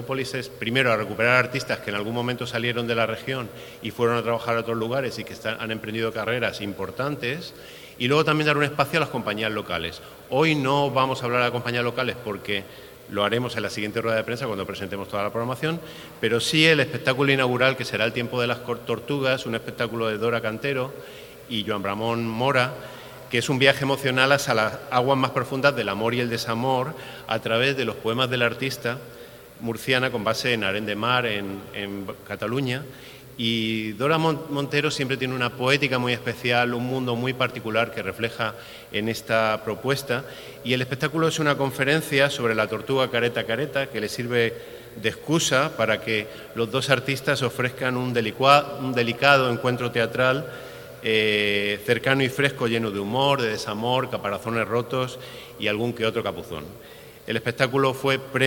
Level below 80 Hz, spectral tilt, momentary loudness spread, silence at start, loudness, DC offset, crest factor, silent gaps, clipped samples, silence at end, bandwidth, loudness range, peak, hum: -58 dBFS; -4.5 dB/octave; 11 LU; 0 s; -24 LUFS; under 0.1%; 24 dB; none; under 0.1%; 0 s; over 20 kHz; 5 LU; 0 dBFS; none